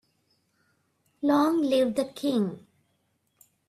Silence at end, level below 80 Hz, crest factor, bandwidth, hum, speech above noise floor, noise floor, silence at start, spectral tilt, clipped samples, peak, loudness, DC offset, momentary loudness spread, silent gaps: 1.1 s; -72 dBFS; 18 dB; 14 kHz; none; 48 dB; -73 dBFS; 1.2 s; -6 dB/octave; under 0.1%; -12 dBFS; -26 LUFS; under 0.1%; 9 LU; none